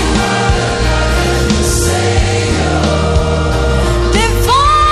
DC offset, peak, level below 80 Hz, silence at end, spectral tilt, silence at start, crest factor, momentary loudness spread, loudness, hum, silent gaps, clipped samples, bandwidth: under 0.1%; 0 dBFS; -16 dBFS; 0 s; -4.5 dB/octave; 0 s; 10 dB; 3 LU; -12 LUFS; none; none; under 0.1%; 14 kHz